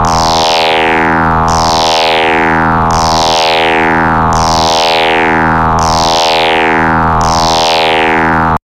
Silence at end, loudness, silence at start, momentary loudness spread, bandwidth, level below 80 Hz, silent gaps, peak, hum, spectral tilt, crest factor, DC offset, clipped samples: 0.05 s; -8 LUFS; 0 s; 1 LU; 17 kHz; -26 dBFS; none; -2 dBFS; none; -3.5 dB/octave; 6 dB; under 0.1%; under 0.1%